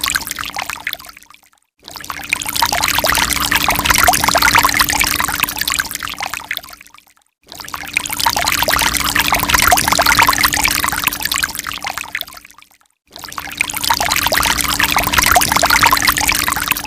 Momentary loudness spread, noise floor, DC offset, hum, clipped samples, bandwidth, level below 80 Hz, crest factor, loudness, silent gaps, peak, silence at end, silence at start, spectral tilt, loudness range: 14 LU; -48 dBFS; under 0.1%; none; under 0.1%; 19 kHz; -34 dBFS; 16 dB; -13 LUFS; none; 0 dBFS; 0 s; 0 s; -1 dB/octave; 7 LU